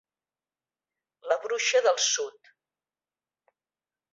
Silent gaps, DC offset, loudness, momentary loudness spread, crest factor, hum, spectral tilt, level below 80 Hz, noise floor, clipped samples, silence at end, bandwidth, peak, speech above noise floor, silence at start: none; under 0.1%; -25 LUFS; 13 LU; 20 dB; none; 3.5 dB/octave; -88 dBFS; under -90 dBFS; under 0.1%; 1.85 s; 8 kHz; -10 dBFS; over 64 dB; 1.25 s